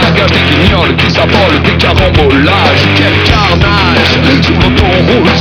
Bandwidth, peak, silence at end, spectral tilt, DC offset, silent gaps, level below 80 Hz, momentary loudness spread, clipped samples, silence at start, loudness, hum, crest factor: 5.4 kHz; 0 dBFS; 0 s; -6 dB/octave; under 0.1%; none; -18 dBFS; 1 LU; 2%; 0 s; -7 LUFS; none; 6 dB